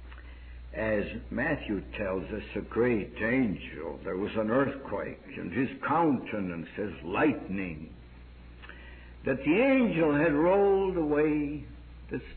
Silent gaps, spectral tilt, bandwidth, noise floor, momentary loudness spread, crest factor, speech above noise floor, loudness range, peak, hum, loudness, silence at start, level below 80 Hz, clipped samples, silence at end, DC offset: none; -10.5 dB/octave; 4.5 kHz; -49 dBFS; 23 LU; 16 dB; 20 dB; 6 LU; -14 dBFS; none; -29 LUFS; 0 s; -48 dBFS; under 0.1%; 0 s; under 0.1%